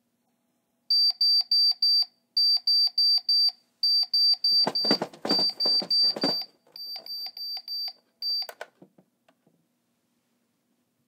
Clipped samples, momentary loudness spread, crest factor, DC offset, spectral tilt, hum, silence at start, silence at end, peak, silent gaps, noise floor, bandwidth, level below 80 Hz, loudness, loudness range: under 0.1%; 15 LU; 18 dB; under 0.1%; -2.5 dB/octave; none; 0.9 s; 2.45 s; -8 dBFS; none; -74 dBFS; 16 kHz; -88 dBFS; -22 LUFS; 14 LU